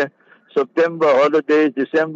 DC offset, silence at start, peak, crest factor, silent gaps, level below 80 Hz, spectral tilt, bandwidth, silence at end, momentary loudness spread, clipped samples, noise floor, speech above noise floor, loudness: under 0.1%; 0 s; -4 dBFS; 12 dB; none; -74 dBFS; -6 dB/octave; 7.6 kHz; 0 s; 9 LU; under 0.1%; -38 dBFS; 22 dB; -17 LUFS